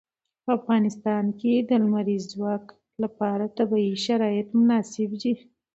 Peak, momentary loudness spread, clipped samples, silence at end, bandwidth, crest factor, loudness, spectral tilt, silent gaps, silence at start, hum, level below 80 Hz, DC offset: -10 dBFS; 10 LU; under 0.1%; 0.4 s; 8 kHz; 14 dB; -25 LUFS; -6.5 dB/octave; none; 0.45 s; none; -72 dBFS; under 0.1%